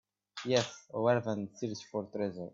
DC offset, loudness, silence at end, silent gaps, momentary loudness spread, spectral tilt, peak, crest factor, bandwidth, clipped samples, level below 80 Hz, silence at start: under 0.1%; -34 LUFS; 0.05 s; none; 10 LU; -5 dB/octave; -14 dBFS; 20 dB; 7.8 kHz; under 0.1%; -76 dBFS; 0.35 s